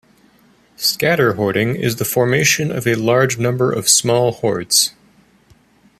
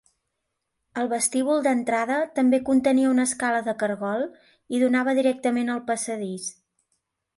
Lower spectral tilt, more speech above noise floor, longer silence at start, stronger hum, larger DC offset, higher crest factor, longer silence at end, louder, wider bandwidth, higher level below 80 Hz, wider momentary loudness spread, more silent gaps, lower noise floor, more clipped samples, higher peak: about the same, -3.5 dB/octave vs -4 dB/octave; second, 37 dB vs 56 dB; second, 0.8 s vs 0.95 s; neither; neither; about the same, 18 dB vs 16 dB; first, 1.1 s vs 0.85 s; first, -15 LUFS vs -24 LUFS; first, 15 kHz vs 11.5 kHz; first, -54 dBFS vs -68 dBFS; second, 6 LU vs 10 LU; neither; second, -53 dBFS vs -79 dBFS; neither; first, 0 dBFS vs -8 dBFS